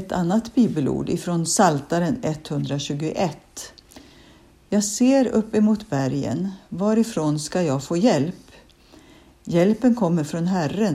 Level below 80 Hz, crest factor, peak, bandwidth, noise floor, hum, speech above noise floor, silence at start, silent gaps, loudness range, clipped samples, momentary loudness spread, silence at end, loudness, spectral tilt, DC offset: -54 dBFS; 18 dB; -4 dBFS; 14.5 kHz; -51 dBFS; none; 30 dB; 0 s; none; 3 LU; under 0.1%; 9 LU; 0 s; -22 LUFS; -5.5 dB/octave; under 0.1%